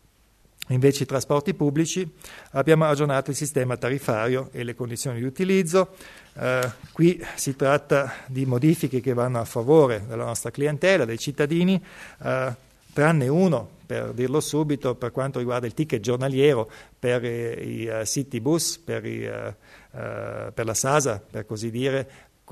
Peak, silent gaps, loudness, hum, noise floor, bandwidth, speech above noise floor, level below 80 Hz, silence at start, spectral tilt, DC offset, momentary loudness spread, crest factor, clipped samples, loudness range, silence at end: -4 dBFS; none; -24 LUFS; none; -59 dBFS; 13.5 kHz; 36 dB; -58 dBFS; 0.7 s; -5.5 dB/octave; under 0.1%; 12 LU; 20 dB; under 0.1%; 5 LU; 0 s